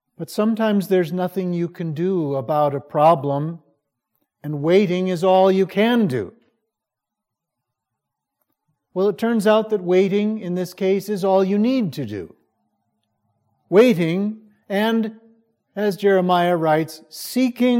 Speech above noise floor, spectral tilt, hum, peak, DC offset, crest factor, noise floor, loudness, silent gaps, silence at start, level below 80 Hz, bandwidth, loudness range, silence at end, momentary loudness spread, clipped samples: 65 dB; -6.5 dB/octave; none; -2 dBFS; under 0.1%; 18 dB; -84 dBFS; -19 LUFS; none; 0.2 s; -72 dBFS; 16.5 kHz; 4 LU; 0 s; 13 LU; under 0.1%